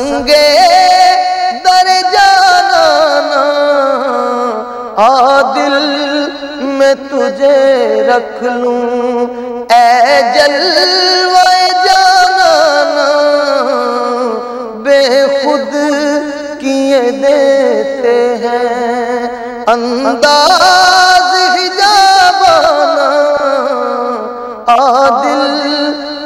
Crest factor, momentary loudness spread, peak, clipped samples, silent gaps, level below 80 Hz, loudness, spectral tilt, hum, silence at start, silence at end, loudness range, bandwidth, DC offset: 8 dB; 10 LU; 0 dBFS; under 0.1%; none; -48 dBFS; -9 LUFS; -1.5 dB/octave; 50 Hz at -55 dBFS; 0 s; 0 s; 4 LU; 15.5 kHz; under 0.1%